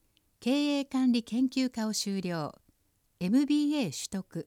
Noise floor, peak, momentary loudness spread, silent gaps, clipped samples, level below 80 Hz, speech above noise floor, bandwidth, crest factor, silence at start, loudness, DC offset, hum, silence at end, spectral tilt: -72 dBFS; -16 dBFS; 9 LU; none; under 0.1%; -70 dBFS; 43 dB; 16.5 kHz; 14 dB; 0.4 s; -30 LUFS; under 0.1%; none; 0.05 s; -4.5 dB/octave